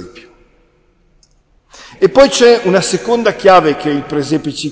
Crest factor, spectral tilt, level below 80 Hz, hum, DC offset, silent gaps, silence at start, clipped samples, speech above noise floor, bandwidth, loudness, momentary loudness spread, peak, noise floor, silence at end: 14 dB; -4 dB/octave; -44 dBFS; none; under 0.1%; none; 0 s; 0.2%; 42 dB; 8 kHz; -11 LUFS; 10 LU; 0 dBFS; -53 dBFS; 0 s